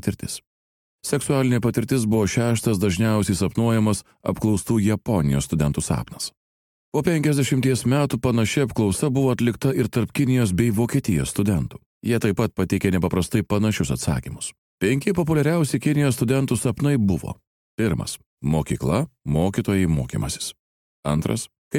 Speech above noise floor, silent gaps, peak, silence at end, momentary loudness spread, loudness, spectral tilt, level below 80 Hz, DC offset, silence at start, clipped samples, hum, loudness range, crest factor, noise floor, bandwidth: over 69 dB; 0.47-0.99 s, 6.37-6.92 s, 11.86-12.01 s, 14.58-14.78 s, 17.47-17.78 s, 18.26-18.37 s, 20.59-21.03 s, 21.58-21.71 s; -6 dBFS; 0 s; 9 LU; -22 LUFS; -6 dB/octave; -42 dBFS; under 0.1%; 0.05 s; under 0.1%; none; 3 LU; 16 dB; under -90 dBFS; 17 kHz